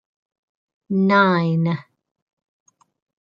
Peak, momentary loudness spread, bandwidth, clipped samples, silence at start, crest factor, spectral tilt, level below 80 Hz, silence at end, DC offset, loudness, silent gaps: -2 dBFS; 10 LU; 7 kHz; under 0.1%; 0.9 s; 20 dB; -8.5 dB/octave; -68 dBFS; 1.4 s; under 0.1%; -19 LUFS; none